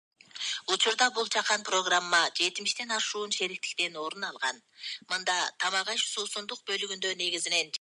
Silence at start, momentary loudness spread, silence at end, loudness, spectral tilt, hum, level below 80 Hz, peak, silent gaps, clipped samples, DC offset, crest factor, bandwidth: 0.35 s; 10 LU; 0.05 s; -28 LUFS; 0.5 dB/octave; none; under -90 dBFS; -10 dBFS; none; under 0.1%; under 0.1%; 20 dB; 11.5 kHz